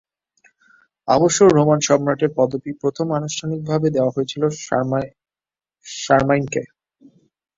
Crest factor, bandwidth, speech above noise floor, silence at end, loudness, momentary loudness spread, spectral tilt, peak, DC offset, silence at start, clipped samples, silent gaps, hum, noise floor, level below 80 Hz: 18 dB; 7.8 kHz; over 72 dB; 0.9 s; -19 LUFS; 13 LU; -5 dB/octave; -2 dBFS; under 0.1%; 1.05 s; under 0.1%; none; none; under -90 dBFS; -54 dBFS